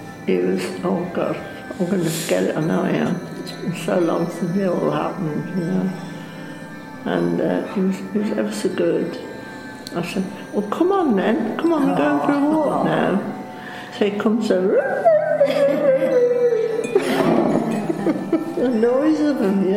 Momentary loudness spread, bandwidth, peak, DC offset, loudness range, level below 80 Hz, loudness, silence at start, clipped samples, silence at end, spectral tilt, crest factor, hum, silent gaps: 13 LU; 16 kHz; -2 dBFS; under 0.1%; 6 LU; -60 dBFS; -20 LUFS; 0 s; under 0.1%; 0 s; -6.5 dB/octave; 18 dB; none; none